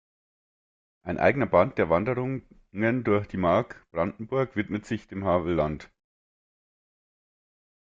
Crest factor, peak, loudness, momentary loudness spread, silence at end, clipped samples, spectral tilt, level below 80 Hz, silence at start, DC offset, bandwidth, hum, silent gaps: 22 dB; -6 dBFS; -26 LUFS; 12 LU; 2.05 s; under 0.1%; -8 dB/octave; -54 dBFS; 1.05 s; under 0.1%; 7.6 kHz; none; none